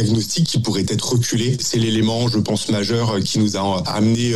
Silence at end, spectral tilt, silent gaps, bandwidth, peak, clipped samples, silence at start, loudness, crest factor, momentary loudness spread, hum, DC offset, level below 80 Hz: 0 s; -5 dB/octave; none; 15 kHz; -6 dBFS; under 0.1%; 0 s; -19 LUFS; 12 dB; 2 LU; none; 1%; -50 dBFS